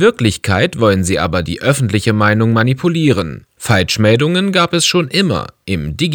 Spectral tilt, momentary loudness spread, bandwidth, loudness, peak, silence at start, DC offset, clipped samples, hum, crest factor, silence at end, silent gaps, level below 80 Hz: -5 dB/octave; 7 LU; 19 kHz; -14 LUFS; 0 dBFS; 0 s; under 0.1%; under 0.1%; none; 14 dB; 0 s; none; -38 dBFS